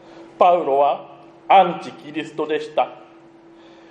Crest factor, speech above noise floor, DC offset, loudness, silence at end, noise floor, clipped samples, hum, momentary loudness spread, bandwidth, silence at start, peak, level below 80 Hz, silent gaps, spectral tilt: 20 dB; 29 dB; under 0.1%; -19 LUFS; 0.95 s; -47 dBFS; under 0.1%; none; 15 LU; 9 kHz; 0.15 s; 0 dBFS; -72 dBFS; none; -5.5 dB/octave